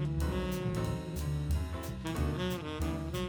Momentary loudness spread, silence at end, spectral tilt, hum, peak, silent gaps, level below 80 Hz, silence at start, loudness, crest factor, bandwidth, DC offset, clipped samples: 3 LU; 0 s; -6.5 dB/octave; none; -20 dBFS; none; -40 dBFS; 0 s; -35 LUFS; 14 dB; over 20 kHz; under 0.1%; under 0.1%